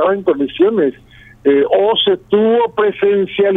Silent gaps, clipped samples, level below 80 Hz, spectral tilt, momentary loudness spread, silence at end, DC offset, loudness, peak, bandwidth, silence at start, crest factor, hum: none; under 0.1%; -52 dBFS; -7.5 dB/octave; 5 LU; 0 s; under 0.1%; -14 LUFS; 0 dBFS; 3.9 kHz; 0 s; 12 dB; none